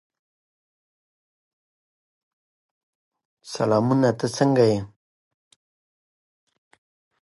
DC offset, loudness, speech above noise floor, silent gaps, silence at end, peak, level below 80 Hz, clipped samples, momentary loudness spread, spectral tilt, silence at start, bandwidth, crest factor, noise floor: under 0.1%; -21 LUFS; over 70 dB; none; 2.35 s; -6 dBFS; -64 dBFS; under 0.1%; 13 LU; -6.5 dB/octave; 3.45 s; 11.5 kHz; 22 dB; under -90 dBFS